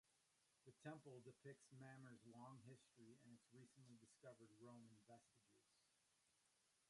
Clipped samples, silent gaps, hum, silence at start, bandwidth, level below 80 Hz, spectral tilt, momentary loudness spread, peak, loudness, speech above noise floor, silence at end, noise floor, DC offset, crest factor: under 0.1%; none; none; 0.05 s; 11 kHz; under -90 dBFS; -5.5 dB/octave; 8 LU; -44 dBFS; -65 LUFS; 19 dB; 0 s; -85 dBFS; under 0.1%; 24 dB